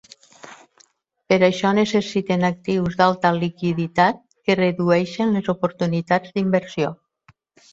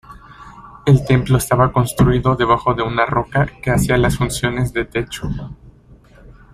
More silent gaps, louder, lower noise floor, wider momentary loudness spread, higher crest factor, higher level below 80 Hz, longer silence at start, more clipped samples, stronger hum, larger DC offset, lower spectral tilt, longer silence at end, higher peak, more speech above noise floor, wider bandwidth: neither; second, -20 LUFS vs -17 LUFS; first, -59 dBFS vs -46 dBFS; second, 6 LU vs 9 LU; about the same, 18 dB vs 16 dB; second, -58 dBFS vs -34 dBFS; first, 0.45 s vs 0.1 s; neither; neither; neither; about the same, -6.5 dB/octave vs -6 dB/octave; first, 0.8 s vs 0.2 s; about the same, -2 dBFS vs -2 dBFS; first, 40 dB vs 30 dB; second, 7.8 kHz vs 14.5 kHz